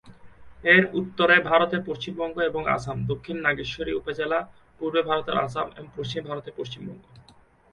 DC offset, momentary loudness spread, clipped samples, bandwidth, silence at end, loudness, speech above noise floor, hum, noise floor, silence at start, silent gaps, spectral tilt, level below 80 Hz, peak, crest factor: under 0.1%; 17 LU; under 0.1%; 10.5 kHz; 0.5 s; -24 LUFS; 31 dB; none; -56 dBFS; 0.05 s; none; -6 dB/octave; -54 dBFS; -4 dBFS; 22 dB